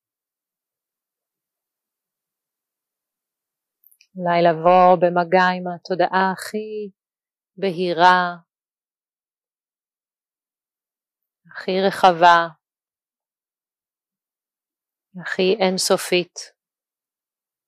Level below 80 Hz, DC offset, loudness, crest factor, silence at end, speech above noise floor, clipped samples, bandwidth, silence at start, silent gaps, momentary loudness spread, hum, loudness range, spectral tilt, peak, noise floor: -72 dBFS; under 0.1%; -18 LUFS; 22 dB; 1.2 s; over 72 dB; under 0.1%; 15 kHz; 4.15 s; none; 16 LU; none; 8 LU; -4.5 dB/octave; -2 dBFS; under -90 dBFS